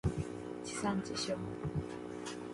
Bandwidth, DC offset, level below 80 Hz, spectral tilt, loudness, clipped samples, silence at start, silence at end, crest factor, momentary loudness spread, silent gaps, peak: 11.5 kHz; under 0.1%; -52 dBFS; -5 dB/octave; -39 LUFS; under 0.1%; 0.05 s; 0 s; 16 dB; 7 LU; none; -22 dBFS